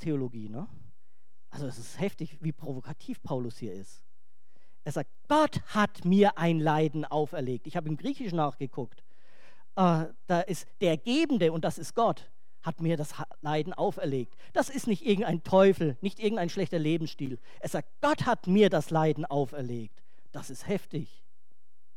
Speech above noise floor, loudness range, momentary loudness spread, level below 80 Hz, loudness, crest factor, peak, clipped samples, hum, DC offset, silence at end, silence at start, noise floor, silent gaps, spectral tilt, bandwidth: 49 dB; 10 LU; 16 LU; -66 dBFS; -29 LUFS; 20 dB; -10 dBFS; under 0.1%; none; 1%; 0.9 s; 0 s; -78 dBFS; none; -6.5 dB/octave; 15.5 kHz